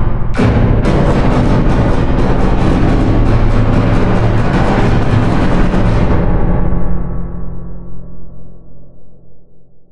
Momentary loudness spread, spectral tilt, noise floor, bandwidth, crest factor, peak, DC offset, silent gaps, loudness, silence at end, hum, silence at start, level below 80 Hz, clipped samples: 12 LU; -8.5 dB/octave; -33 dBFS; 9.4 kHz; 10 dB; 0 dBFS; under 0.1%; none; -13 LUFS; 0.05 s; none; 0 s; -16 dBFS; under 0.1%